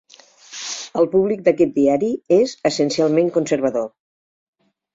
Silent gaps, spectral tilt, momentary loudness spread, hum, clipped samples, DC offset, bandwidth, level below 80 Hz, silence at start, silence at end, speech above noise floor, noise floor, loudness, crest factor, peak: none; -5 dB/octave; 11 LU; none; under 0.1%; under 0.1%; 7.8 kHz; -62 dBFS; 0.5 s; 1.05 s; 29 dB; -46 dBFS; -18 LUFS; 18 dB; -2 dBFS